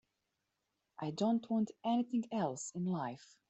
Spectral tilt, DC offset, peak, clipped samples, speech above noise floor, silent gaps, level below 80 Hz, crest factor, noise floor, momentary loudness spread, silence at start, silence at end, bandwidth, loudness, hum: -6 dB/octave; under 0.1%; -22 dBFS; under 0.1%; 49 dB; none; -82 dBFS; 16 dB; -86 dBFS; 8 LU; 1 s; 0.35 s; 8.2 kHz; -37 LUFS; none